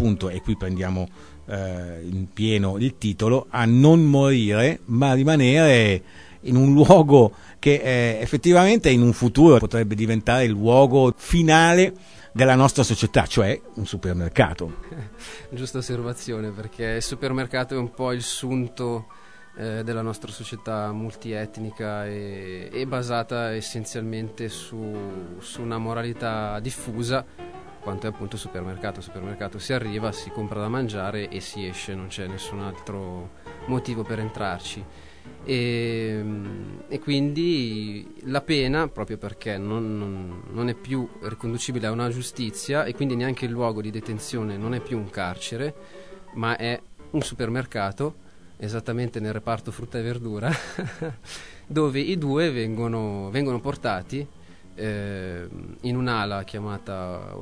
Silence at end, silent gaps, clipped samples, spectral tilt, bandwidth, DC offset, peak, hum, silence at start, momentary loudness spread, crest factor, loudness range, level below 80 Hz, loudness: 0 s; none; under 0.1%; -6 dB/octave; 11 kHz; 0.4%; 0 dBFS; none; 0 s; 18 LU; 22 dB; 14 LU; -44 dBFS; -23 LUFS